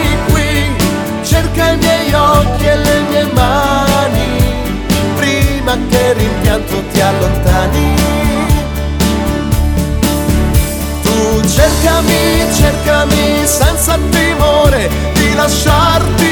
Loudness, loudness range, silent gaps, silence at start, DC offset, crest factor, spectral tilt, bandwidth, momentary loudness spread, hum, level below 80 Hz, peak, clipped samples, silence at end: -11 LUFS; 2 LU; none; 0 s; under 0.1%; 10 dB; -4.5 dB/octave; 19.5 kHz; 5 LU; none; -18 dBFS; 0 dBFS; 0.1%; 0 s